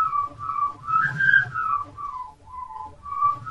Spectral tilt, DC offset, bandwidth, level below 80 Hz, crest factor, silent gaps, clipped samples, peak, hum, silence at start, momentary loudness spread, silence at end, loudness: -4.5 dB/octave; 0.2%; 11 kHz; -56 dBFS; 18 dB; none; under 0.1%; -6 dBFS; none; 0 s; 19 LU; 0 s; -23 LUFS